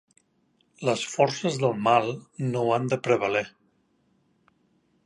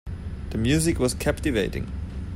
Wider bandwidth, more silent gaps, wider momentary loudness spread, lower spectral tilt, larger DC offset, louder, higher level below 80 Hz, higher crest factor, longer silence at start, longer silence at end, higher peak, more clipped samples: second, 11.5 kHz vs 16 kHz; neither; second, 8 LU vs 12 LU; about the same, -5 dB/octave vs -5 dB/octave; neither; about the same, -25 LUFS vs -25 LUFS; second, -70 dBFS vs -34 dBFS; first, 22 dB vs 16 dB; first, 0.8 s vs 0.05 s; first, 1.55 s vs 0 s; first, -6 dBFS vs -10 dBFS; neither